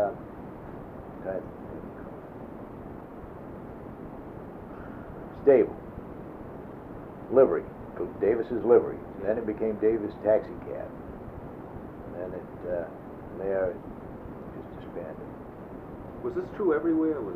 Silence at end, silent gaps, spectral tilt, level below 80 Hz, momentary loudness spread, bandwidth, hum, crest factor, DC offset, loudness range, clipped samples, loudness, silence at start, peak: 0 s; none; -10 dB/octave; -52 dBFS; 20 LU; 4.4 kHz; none; 22 dB; under 0.1%; 14 LU; under 0.1%; -28 LUFS; 0 s; -8 dBFS